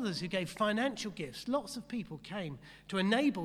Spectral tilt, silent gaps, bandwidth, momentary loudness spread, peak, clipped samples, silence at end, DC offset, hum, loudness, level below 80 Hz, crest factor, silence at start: -5 dB/octave; none; 14 kHz; 11 LU; -16 dBFS; under 0.1%; 0 s; under 0.1%; none; -35 LUFS; -66 dBFS; 18 dB; 0 s